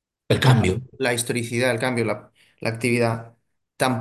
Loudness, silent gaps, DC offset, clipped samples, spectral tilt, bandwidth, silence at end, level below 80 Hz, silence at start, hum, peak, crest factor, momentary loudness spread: -22 LUFS; none; under 0.1%; under 0.1%; -5.5 dB/octave; 12.5 kHz; 0 s; -46 dBFS; 0.3 s; none; -2 dBFS; 22 dB; 11 LU